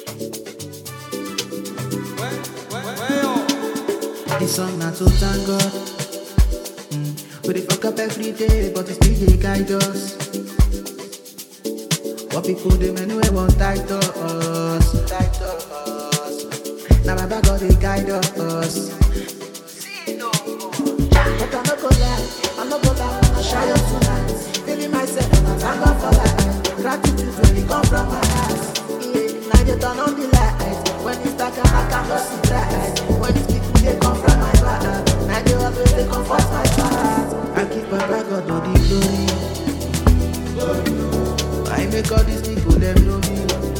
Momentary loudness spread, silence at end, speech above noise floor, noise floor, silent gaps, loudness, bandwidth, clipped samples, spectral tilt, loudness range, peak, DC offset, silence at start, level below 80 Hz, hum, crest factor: 11 LU; 0 s; 21 dB; -38 dBFS; none; -19 LUFS; 18.5 kHz; under 0.1%; -5 dB/octave; 5 LU; 0 dBFS; under 0.1%; 0 s; -22 dBFS; none; 18 dB